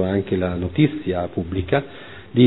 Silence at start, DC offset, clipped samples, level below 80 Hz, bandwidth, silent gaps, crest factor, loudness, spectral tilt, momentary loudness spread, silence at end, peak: 0 s; 0.5%; under 0.1%; -44 dBFS; 4.1 kHz; none; 18 dB; -22 LUFS; -11 dB/octave; 6 LU; 0 s; -2 dBFS